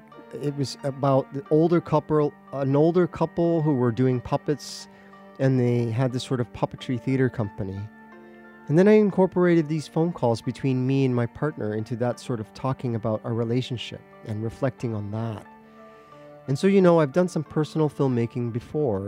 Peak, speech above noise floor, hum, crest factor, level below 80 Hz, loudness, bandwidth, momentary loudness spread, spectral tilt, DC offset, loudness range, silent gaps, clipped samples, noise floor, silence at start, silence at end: -6 dBFS; 25 dB; none; 18 dB; -58 dBFS; -24 LUFS; 12.5 kHz; 12 LU; -7.5 dB/octave; under 0.1%; 6 LU; none; under 0.1%; -48 dBFS; 0.15 s; 0 s